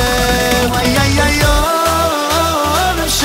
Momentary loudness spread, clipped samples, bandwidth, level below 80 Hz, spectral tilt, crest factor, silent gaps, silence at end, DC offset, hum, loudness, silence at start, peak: 2 LU; under 0.1%; 16.5 kHz; -22 dBFS; -3.5 dB/octave; 12 dB; none; 0 s; under 0.1%; none; -13 LUFS; 0 s; 0 dBFS